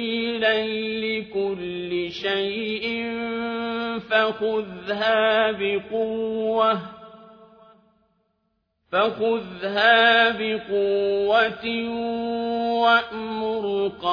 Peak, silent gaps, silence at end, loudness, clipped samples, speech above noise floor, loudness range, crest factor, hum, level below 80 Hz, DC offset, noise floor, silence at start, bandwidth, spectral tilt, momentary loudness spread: -2 dBFS; none; 0 s; -23 LUFS; under 0.1%; 50 dB; 6 LU; 20 dB; none; -62 dBFS; under 0.1%; -73 dBFS; 0 s; 5.4 kHz; -5.5 dB/octave; 9 LU